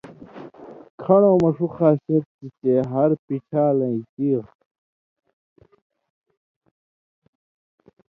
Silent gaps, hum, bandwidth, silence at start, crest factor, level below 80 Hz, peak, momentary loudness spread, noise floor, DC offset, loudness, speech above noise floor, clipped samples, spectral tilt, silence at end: 0.90-0.98 s, 2.26-2.39 s, 3.19-3.28 s, 4.09-4.17 s; none; 7 kHz; 0.05 s; 20 dB; -62 dBFS; -2 dBFS; 24 LU; -41 dBFS; under 0.1%; -20 LUFS; 21 dB; under 0.1%; -11 dB/octave; 3.65 s